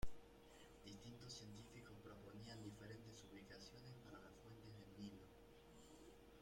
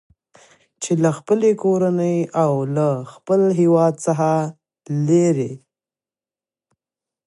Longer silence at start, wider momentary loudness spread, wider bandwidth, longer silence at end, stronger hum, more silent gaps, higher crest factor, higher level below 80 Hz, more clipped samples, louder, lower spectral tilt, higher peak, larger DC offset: second, 0 s vs 0.8 s; second, 9 LU vs 12 LU; first, 16.5 kHz vs 11.5 kHz; second, 0 s vs 1.7 s; neither; neither; first, 22 dB vs 16 dB; about the same, -66 dBFS vs -68 dBFS; neither; second, -61 LUFS vs -19 LUFS; second, -5 dB/octave vs -7.5 dB/octave; second, -32 dBFS vs -4 dBFS; neither